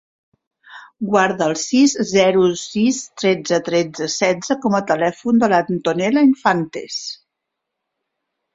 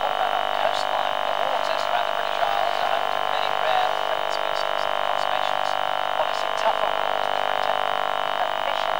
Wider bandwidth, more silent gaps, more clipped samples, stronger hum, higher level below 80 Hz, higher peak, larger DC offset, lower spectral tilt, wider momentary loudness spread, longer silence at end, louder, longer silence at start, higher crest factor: second, 7.8 kHz vs over 20 kHz; neither; neither; second, none vs 50 Hz at -55 dBFS; about the same, -60 dBFS vs -62 dBFS; first, 0 dBFS vs -6 dBFS; second, under 0.1% vs 1%; first, -4.5 dB/octave vs -1.5 dB/octave; first, 9 LU vs 2 LU; first, 1.4 s vs 0 s; first, -17 LUFS vs -23 LUFS; first, 0.7 s vs 0 s; about the same, 18 dB vs 18 dB